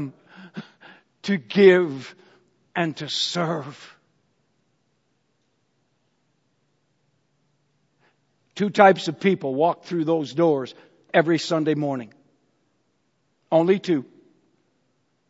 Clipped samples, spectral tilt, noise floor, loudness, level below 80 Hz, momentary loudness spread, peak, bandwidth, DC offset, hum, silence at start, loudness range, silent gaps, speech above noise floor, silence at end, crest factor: under 0.1%; -5.5 dB/octave; -70 dBFS; -21 LUFS; -76 dBFS; 22 LU; 0 dBFS; 8 kHz; under 0.1%; none; 0 s; 8 LU; none; 50 dB; 1.25 s; 24 dB